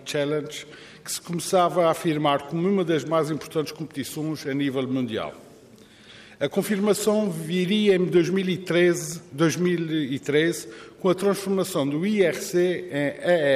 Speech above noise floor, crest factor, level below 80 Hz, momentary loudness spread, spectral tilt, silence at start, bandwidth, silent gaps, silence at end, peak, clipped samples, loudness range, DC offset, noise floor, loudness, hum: 26 dB; 16 dB; -66 dBFS; 11 LU; -5 dB/octave; 0 s; 15.5 kHz; none; 0 s; -8 dBFS; under 0.1%; 5 LU; under 0.1%; -50 dBFS; -24 LUFS; none